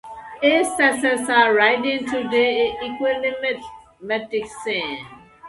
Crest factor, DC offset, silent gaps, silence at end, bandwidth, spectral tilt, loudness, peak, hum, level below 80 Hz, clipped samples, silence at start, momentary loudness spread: 20 dB; under 0.1%; none; 0 s; 11.5 kHz; -2.5 dB/octave; -20 LUFS; -2 dBFS; none; -58 dBFS; under 0.1%; 0.05 s; 13 LU